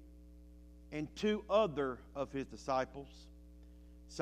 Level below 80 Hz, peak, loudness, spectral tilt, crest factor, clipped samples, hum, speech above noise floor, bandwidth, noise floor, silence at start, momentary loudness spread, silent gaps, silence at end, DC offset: -58 dBFS; -18 dBFS; -38 LUFS; -5.5 dB/octave; 22 dB; under 0.1%; none; 19 dB; 13.5 kHz; -57 dBFS; 0 s; 26 LU; none; 0 s; under 0.1%